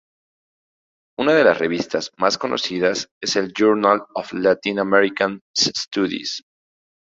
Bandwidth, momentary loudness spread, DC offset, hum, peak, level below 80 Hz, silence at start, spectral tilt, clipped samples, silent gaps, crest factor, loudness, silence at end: 7.8 kHz; 9 LU; under 0.1%; none; -2 dBFS; -62 dBFS; 1.2 s; -3.5 dB/octave; under 0.1%; 3.11-3.21 s, 5.41-5.54 s; 20 dB; -19 LUFS; 0.8 s